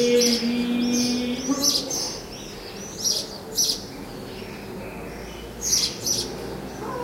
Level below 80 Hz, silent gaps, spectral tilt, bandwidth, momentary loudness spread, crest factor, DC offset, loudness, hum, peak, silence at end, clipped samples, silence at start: -48 dBFS; none; -2 dB/octave; 16 kHz; 15 LU; 18 dB; under 0.1%; -23 LUFS; none; -8 dBFS; 0 s; under 0.1%; 0 s